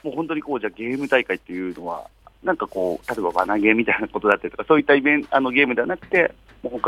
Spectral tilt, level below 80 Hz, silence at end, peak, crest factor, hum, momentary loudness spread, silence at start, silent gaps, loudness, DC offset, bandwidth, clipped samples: -6 dB/octave; -54 dBFS; 0 s; 0 dBFS; 22 dB; none; 12 LU; 0.05 s; none; -21 LUFS; under 0.1%; 13.5 kHz; under 0.1%